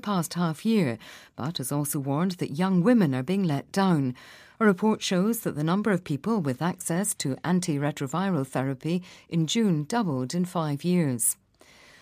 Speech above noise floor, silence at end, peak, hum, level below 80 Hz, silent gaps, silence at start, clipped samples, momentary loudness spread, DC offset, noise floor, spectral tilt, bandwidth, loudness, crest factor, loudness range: 29 dB; 0.7 s; -8 dBFS; none; -68 dBFS; none; 0.05 s; under 0.1%; 7 LU; under 0.1%; -55 dBFS; -5.5 dB/octave; 15.5 kHz; -26 LUFS; 18 dB; 3 LU